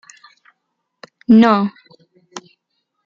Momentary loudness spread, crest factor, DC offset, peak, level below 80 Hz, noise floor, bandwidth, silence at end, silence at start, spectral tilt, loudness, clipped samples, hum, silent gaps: 26 LU; 16 dB; under 0.1%; -2 dBFS; -64 dBFS; -74 dBFS; 7.4 kHz; 0.65 s; 1.3 s; -6.5 dB/octave; -13 LUFS; under 0.1%; none; none